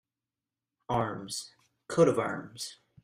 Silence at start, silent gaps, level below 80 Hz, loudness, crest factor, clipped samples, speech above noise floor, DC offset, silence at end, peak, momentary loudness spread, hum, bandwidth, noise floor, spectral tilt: 0.9 s; none; -64 dBFS; -31 LUFS; 22 dB; under 0.1%; over 60 dB; under 0.1%; 0.3 s; -10 dBFS; 15 LU; none; 15.5 kHz; under -90 dBFS; -5 dB/octave